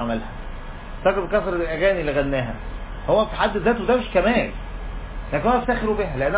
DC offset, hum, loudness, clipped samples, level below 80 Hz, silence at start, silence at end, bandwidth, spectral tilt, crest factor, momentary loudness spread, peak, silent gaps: under 0.1%; none; -22 LUFS; under 0.1%; -34 dBFS; 0 s; 0 s; 4 kHz; -10 dB/octave; 16 dB; 15 LU; -6 dBFS; none